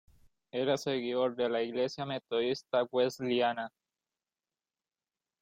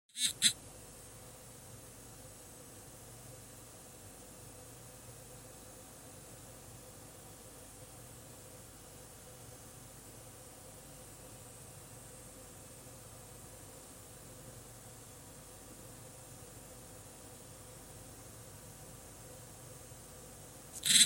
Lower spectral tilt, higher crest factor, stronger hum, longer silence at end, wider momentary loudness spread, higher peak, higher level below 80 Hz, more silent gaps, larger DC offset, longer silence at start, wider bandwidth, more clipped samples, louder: first, -5 dB/octave vs -0.5 dB/octave; second, 16 dB vs 34 dB; neither; first, 1.75 s vs 0 s; first, 6 LU vs 1 LU; second, -18 dBFS vs -10 dBFS; second, -76 dBFS vs -64 dBFS; neither; neither; first, 0.55 s vs 0.1 s; about the same, 15.5 kHz vs 17 kHz; neither; first, -32 LUFS vs -44 LUFS